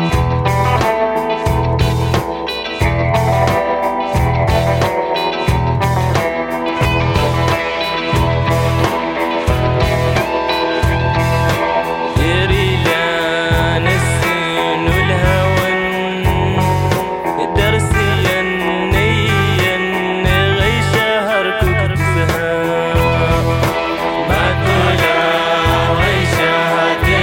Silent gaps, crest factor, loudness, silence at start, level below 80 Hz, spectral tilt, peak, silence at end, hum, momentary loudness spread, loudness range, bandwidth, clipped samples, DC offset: none; 12 dB; -15 LUFS; 0 s; -26 dBFS; -5.5 dB/octave; -2 dBFS; 0 s; none; 4 LU; 2 LU; 17 kHz; under 0.1%; under 0.1%